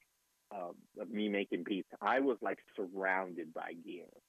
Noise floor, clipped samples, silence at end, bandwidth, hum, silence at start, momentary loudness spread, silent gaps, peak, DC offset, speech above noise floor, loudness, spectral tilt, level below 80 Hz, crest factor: -76 dBFS; under 0.1%; 0.1 s; 13.5 kHz; none; 0.5 s; 15 LU; none; -20 dBFS; under 0.1%; 38 dB; -38 LUFS; -6.5 dB/octave; under -90 dBFS; 18 dB